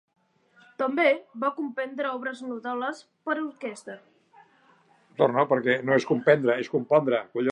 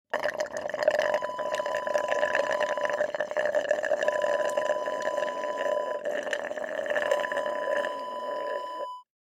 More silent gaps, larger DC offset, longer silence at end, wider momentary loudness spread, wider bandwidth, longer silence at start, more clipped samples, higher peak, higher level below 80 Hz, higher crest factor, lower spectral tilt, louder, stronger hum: neither; neither; second, 0 s vs 0.35 s; first, 15 LU vs 7 LU; second, 11 kHz vs 13.5 kHz; first, 0.8 s vs 0.15 s; neither; first, -6 dBFS vs -10 dBFS; about the same, -78 dBFS vs -74 dBFS; about the same, 20 dB vs 20 dB; first, -6.5 dB/octave vs -2 dB/octave; first, -26 LUFS vs -29 LUFS; neither